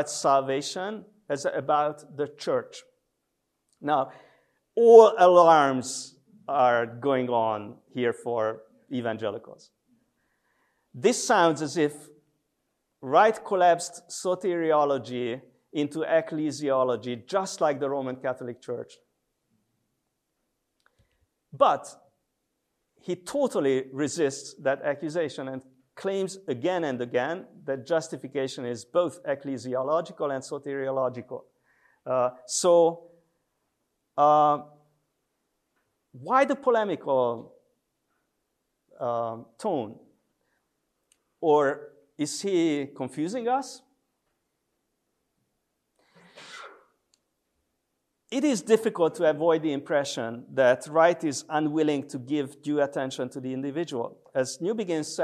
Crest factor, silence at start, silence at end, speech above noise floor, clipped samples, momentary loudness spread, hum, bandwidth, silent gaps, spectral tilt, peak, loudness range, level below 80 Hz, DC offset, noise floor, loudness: 24 dB; 0 s; 0 s; 54 dB; under 0.1%; 14 LU; none; 13 kHz; none; -4.5 dB/octave; -2 dBFS; 11 LU; -80 dBFS; under 0.1%; -79 dBFS; -26 LUFS